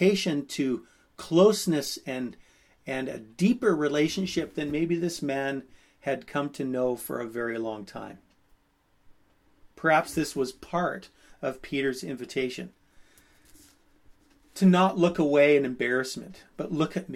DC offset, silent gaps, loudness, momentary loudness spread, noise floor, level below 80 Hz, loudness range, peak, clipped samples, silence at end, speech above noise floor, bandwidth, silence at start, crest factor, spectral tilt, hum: under 0.1%; none; -27 LUFS; 17 LU; -67 dBFS; -60 dBFS; 9 LU; -8 dBFS; under 0.1%; 0 s; 40 dB; 15.5 kHz; 0 s; 20 dB; -5.5 dB/octave; none